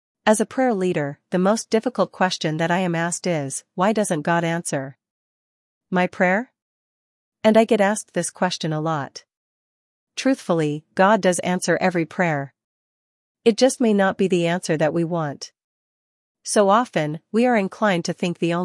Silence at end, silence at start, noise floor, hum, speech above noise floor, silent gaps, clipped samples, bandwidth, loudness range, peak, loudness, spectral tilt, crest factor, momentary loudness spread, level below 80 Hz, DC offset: 0 s; 0.25 s; under -90 dBFS; none; over 70 dB; 5.11-5.81 s, 6.62-7.32 s, 9.37-10.07 s, 12.64-13.35 s, 15.64-16.35 s; under 0.1%; 12 kHz; 2 LU; -2 dBFS; -21 LUFS; -5 dB/octave; 20 dB; 9 LU; -72 dBFS; under 0.1%